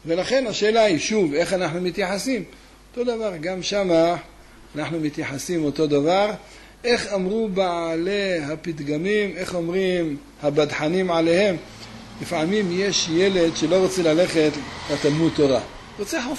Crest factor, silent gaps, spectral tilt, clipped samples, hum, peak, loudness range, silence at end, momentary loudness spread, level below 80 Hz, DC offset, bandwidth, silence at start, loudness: 14 dB; none; -4.5 dB/octave; under 0.1%; none; -8 dBFS; 4 LU; 0 s; 10 LU; -50 dBFS; under 0.1%; 12.5 kHz; 0.05 s; -22 LUFS